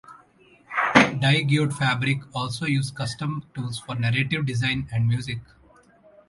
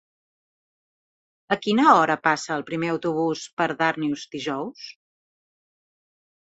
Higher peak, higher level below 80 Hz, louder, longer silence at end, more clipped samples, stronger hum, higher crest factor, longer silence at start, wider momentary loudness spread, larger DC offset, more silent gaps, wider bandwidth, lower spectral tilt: about the same, -2 dBFS vs -4 dBFS; first, -54 dBFS vs -70 dBFS; about the same, -23 LUFS vs -23 LUFS; second, 0.85 s vs 1.6 s; neither; neither; about the same, 22 dB vs 22 dB; second, 0.1 s vs 1.5 s; about the same, 12 LU vs 14 LU; neither; second, none vs 3.53-3.57 s; first, 11.5 kHz vs 8.2 kHz; about the same, -5.5 dB/octave vs -5 dB/octave